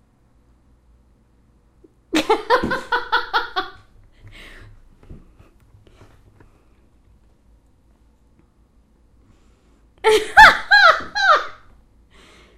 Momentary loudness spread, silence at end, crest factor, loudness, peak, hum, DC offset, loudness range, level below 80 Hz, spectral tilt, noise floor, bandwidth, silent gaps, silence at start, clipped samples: 16 LU; 1.05 s; 22 dB; -15 LUFS; 0 dBFS; none; under 0.1%; 13 LU; -46 dBFS; -2.5 dB/octave; -56 dBFS; 15.5 kHz; none; 2.15 s; under 0.1%